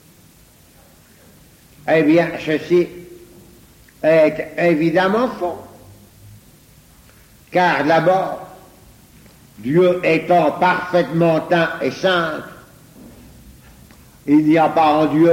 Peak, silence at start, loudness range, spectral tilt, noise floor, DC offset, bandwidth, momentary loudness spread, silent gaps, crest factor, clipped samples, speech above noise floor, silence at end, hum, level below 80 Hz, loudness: -4 dBFS; 1.85 s; 4 LU; -6.5 dB/octave; -49 dBFS; under 0.1%; 16.5 kHz; 12 LU; none; 14 dB; under 0.1%; 33 dB; 0 s; none; -54 dBFS; -16 LUFS